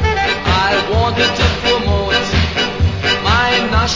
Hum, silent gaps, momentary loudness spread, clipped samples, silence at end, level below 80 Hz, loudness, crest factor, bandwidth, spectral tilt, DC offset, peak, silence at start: none; none; 3 LU; under 0.1%; 0 s; -22 dBFS; -14 LUFS; 14 dB; 7.6 kHz; -4.5 dB/octave; under 0.1%; 0 dBFS; 0 s